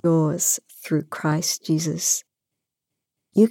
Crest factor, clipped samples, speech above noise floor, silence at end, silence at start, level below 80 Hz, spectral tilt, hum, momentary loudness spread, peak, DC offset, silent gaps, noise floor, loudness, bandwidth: 18 dB; under 0.1%; 61 dB; 0 s; 0.05 s; -74 dBFS; -4.5 dB/octave; none; 6 LU; -6 dBFS; under 0.1%; none; -84 dBFS; -23 LUFS; 17 kHz